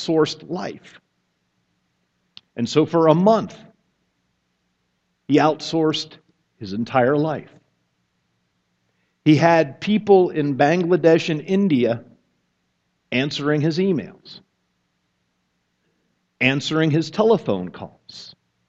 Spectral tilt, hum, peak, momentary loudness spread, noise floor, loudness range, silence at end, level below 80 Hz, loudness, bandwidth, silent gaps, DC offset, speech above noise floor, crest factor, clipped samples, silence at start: -6.5 dB/octave; none; 0 dBFS; 18 LU; -71 dBFS; 7 LU; 0.4 s; -64 dBFS; -19 LUFS; 8 kHz; none; under 0.1%; 52 dB; 22 dB; under 0.1%; 0 s